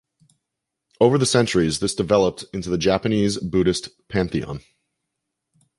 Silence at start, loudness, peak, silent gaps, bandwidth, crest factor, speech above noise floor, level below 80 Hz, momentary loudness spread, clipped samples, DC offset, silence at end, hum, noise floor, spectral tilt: 1 s; -21 LUFS; -2 dBFS; none; 11.5 kHz; 20 dB; 62 dB; -46 dBFS; 10 LU; under 0.1%; under 0.1%; 1.2 s; none; -82 dBFS; -5 dB/octave